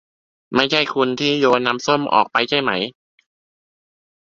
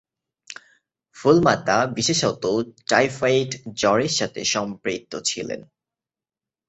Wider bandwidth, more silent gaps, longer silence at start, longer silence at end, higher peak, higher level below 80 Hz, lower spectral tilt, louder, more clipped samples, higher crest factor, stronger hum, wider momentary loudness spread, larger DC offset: about the same, 7.8 kHz vs 8.4 kHz; neither; about the same, 0.5 s vs 0.5 s; first, 1.3 s vs 1.1 s; about the same, 0 dBFS vs -2 dBFS; about the same, -62 dBFS vs -58 dBFS; about the same, -4 dB/octave vs -3.5 dB/octave; first, -18 LUFS vs -21 LUFS; neither; about the same, 20 dB vs 20 dB; neither; second, 6 LU vs 14 LU; neither